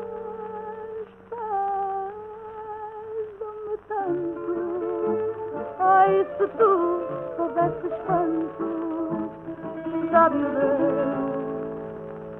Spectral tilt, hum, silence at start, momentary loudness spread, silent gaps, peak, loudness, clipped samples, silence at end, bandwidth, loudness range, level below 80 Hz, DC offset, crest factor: -10 dB/octave; none; 0 s; 16 LU; none; -6 dBFS; -25 LUFS; under 0.1%; 0 s; 3.8 kHz; 9 LU; -60 dBFS; under 0.1%; 20 dB